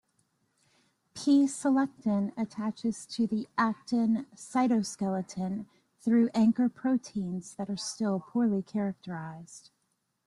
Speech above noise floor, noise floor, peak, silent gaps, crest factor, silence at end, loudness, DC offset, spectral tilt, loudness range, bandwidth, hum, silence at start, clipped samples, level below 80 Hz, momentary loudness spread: 49 dB; -78 dBFS; -14 dBFS; none; 16 dB; 0.65 s; -30 LUFS; under 0.1%; -5.5 dB/octave; 3 LU; 11.5 kHz; none; 1.15 s; under 0.1%; -72 dBFS; 12 LU